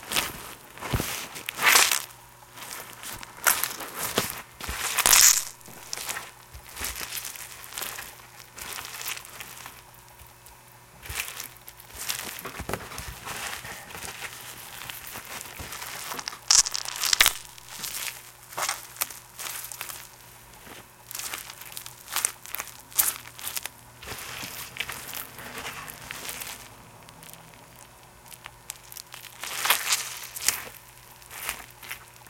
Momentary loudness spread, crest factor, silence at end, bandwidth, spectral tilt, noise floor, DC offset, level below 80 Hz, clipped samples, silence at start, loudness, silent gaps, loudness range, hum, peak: 24 LU; 30 dB; 0 s; 17 kHz; 0 dB/octave; -51 dBFS; under 0.1%; -54 dBFS; under 0.1%; 0 s; -27 LUFS; none; 15 LU; none; 0 dBFS